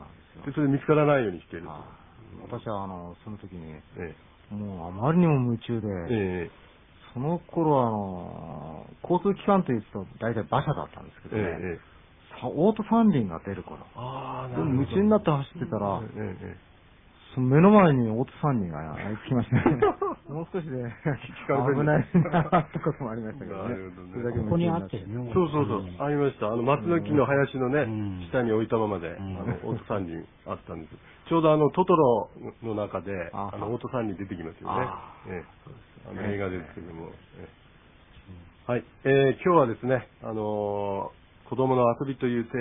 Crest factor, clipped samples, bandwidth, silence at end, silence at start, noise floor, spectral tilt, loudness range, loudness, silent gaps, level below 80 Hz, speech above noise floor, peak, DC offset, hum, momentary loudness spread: 22 dB; under 0.1%; 3.8 kHz; 0 s; 0 s; -55 dBFS; -12 dB/octave; 9 LU; -27 LUFS; none; -54 dBFS; 28 dB; -4 dBFS; under 0.1%; none; 18 LU